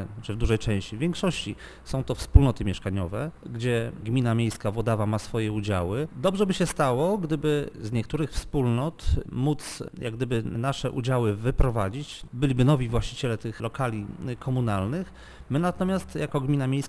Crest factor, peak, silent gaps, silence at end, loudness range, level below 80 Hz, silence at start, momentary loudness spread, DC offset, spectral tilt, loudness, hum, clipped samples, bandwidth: 24 dB; 0 dBFS; none; 0 s; 2 LU; -34 dBFS; 0 s; 10 LU; under 0.1%; -6.5 dB/octave; -27 LUFS; none; under 0.1%; 11 kHz